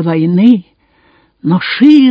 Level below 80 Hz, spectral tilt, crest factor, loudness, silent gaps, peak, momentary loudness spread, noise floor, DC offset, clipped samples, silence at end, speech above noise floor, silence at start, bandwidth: -60 dBFS; -8.5 dB/octave; 10 dB; -10 LUFS; none; 0 dBFS; 8 LU; -51 dBFS; under 0.1%; 1%; 0 s; 43 dB; 0 s; 5.8 kHz